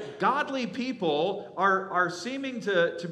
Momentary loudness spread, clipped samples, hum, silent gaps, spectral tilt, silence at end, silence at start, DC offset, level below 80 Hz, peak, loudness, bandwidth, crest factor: 7 LU; under 0.1%; none; none; -5 dB/octave; 0 s; 0 s; under 0.1%; -80 dBFS; -10 dBFS; -28 LUFS; 11 kHz; 16 dB